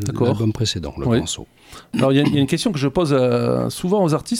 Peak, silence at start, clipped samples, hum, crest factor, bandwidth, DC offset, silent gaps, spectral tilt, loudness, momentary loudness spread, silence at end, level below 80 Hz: -4 dBFS; 0 s; under 0.1%; none; 16 dB; 16 kHz; under 0.1%; none; -6 dB/octave; -19 LUFS; 7 LU; 0 s; -44 dBFS